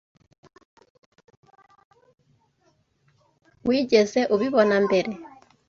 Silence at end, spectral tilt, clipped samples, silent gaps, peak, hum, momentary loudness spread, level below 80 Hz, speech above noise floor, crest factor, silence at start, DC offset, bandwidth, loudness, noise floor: 0.4 s; -5 dB/octave; under 0.1%; none; -6 dBFS; none; 12 LU; -66 dBFS; 46 dB; 20 dB; 3.65 s; under 0.1%; 7.4 kHz; -22 LUFS; -67 dBFS